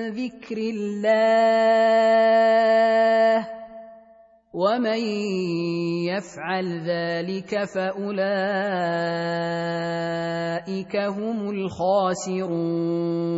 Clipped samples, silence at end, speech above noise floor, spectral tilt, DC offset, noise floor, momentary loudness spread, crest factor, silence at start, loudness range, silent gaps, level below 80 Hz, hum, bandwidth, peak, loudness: under 0.1%; 0 s; 31 dB; -6 dB/octave; under 0.1%; -53 dBFS; 11 LU; 14 dB; 0 s; 7 LU; none; -68 dBFS; none; 8 kHz; -8 dBFS; -23 LUFS